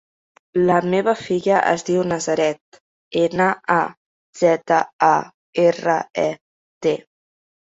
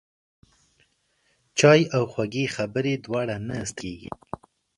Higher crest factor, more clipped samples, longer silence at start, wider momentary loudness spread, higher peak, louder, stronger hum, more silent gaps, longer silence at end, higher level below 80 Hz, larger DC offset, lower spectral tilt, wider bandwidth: about the same, 18 dB vs 22 dB; neither; second, 0.55 s vs 1.55 s; second, 8 LU vs 21 LU; about the same, -2 dBFS vs -4 dBFS; first, -19 LUFS vs -23 LUFS; neither; first, 2.61-2.72 s, 2.80-3.11 s, 3.97-4.33 s, 4.93-4.99 s, 5.34-5.53 s, 6.41-6.81 s vs none; about the same, 0.75 s vs 0.7 s; about the same, -62 dBFS vs -58 dBFS; neither; about the same, -5.5 dB/octave vs -5 dB/octave; second, 8 kHz vs 11.5 kHz